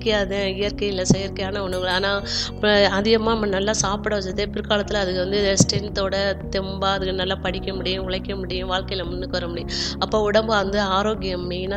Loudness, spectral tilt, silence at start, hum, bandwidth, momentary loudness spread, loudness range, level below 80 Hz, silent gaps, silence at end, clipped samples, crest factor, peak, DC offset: -22 LUFS; -4 dB/octave; 0 s; none; 12.5 kHz; 8 LU; 4 LU; -36 dBFS; none; 0 s; under 0.1%; 22 dB; 0 dBFS; under 0.1%